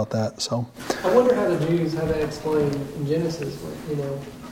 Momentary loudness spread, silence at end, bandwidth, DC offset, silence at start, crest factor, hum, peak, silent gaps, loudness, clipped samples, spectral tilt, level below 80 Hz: 12 LU; 0 s; 16.5 kHz; under 0.1%; 0 s; 18 dB; none; -4 dBFS; none; -24 LUFS; under 0.1%; -6 dB/octave; -48 dBFS